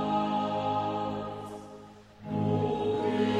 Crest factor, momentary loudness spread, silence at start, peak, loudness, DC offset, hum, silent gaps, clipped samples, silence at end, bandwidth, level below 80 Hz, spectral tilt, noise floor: 14 dB; 16 LU; 0 s; -16 dBFS; -31 LUFS; under 0.1%; none; none; under 0.1%; 0 s; 11.5 kHz; -60 dBFS; -7.5 dB/octave; -50 dBFS